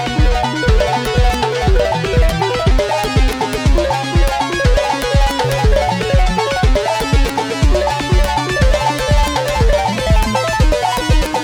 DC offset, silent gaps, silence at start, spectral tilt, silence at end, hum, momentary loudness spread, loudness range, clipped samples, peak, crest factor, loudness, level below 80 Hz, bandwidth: under 0.1%; none; 0 s; -5 dB/octave; 0 s; none; 2 LU; 0 LU; under 0.1%; -2 dBFS; 10 dB; -15 LUFS; -16 dBFS; 16.5 kHz